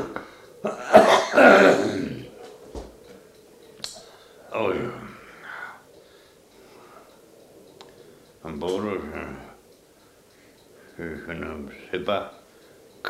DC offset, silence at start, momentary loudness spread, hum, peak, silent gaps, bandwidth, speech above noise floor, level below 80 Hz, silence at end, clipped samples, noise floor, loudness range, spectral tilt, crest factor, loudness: under 0.1%; 0 s; 27 LU; none; -2 dBFS; none; 15.5 kHz; 37 dB; -56 dBFS; 0 s; under 0.1%; -55 dBFS; 19 LU; -4.5 dB/octave; 24 dB; -21 LUFS